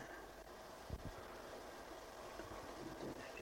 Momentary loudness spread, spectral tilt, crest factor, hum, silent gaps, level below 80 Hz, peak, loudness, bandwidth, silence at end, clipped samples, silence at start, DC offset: 5 LU; -4.5 dB/octave; 18 dB; none; none; -62 dBFS; -34 dBFS; -52 LUFS; 16.5 kHz; 0 s; under 0.1%; 0 s; under 0.1%